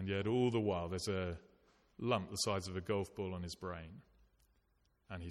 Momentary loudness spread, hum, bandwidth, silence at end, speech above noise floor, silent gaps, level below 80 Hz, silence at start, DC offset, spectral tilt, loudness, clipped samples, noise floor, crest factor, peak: 15 LU; none; 14 kHz; 0 s; 38 dB; none; -62 dBFS; 0 s; under 0.1%; -5 dB/octave; -39 LUFS; under 0.1%; -77 dBFS; 20 dB; -20 dBFS